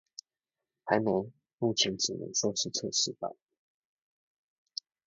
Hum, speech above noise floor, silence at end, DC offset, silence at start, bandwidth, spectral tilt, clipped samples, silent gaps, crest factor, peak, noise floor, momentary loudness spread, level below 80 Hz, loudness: none; over 59 dB; 1.75 s; under 0.1%; 0.85 s; 8 kHz; -2.5 dB/octave; under 0.1%; 1.53-1.58 s; 24 dB; -10 dBFS; under -90 dBFS; 17 LU; -72 dBFS; -30 LUFS